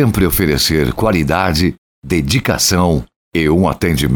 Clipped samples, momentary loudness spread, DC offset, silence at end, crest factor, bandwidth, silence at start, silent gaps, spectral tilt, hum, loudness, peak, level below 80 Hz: under 0.1%; 6 LU; under 0.1%; 0 s; 12 dB; over 20 kHz; 0 s; 1.78-2.02 s, 3.16-3.32 s; -4.5 dB/octave; none; -14 LUFS; -2 dBFS; -28 dBFS